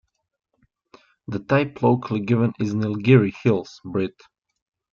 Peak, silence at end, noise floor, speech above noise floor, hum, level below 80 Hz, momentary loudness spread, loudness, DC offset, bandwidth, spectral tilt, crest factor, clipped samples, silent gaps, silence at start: -4 dBFS; 0.8 s; -68 dBFS; 47 dB; none; -60 dBFS; 13 LU; -22 LUFS; under 0.1%; 7 kHz; -8.5 dB/octave; 20 dB; under 0.1%; none; 1.3 s